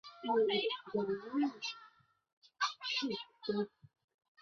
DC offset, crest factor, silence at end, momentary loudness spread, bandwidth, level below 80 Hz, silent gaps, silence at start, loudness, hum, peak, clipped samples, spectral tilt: under 0.1%; 16 dB; 0.75 s; 10 LU; 7.2 kHz; -80 dBFS; 2.33-2.42 s; 0.05 s; -37 LUFS; none; -22 dBFS; under 0.1%; -2 dB/octave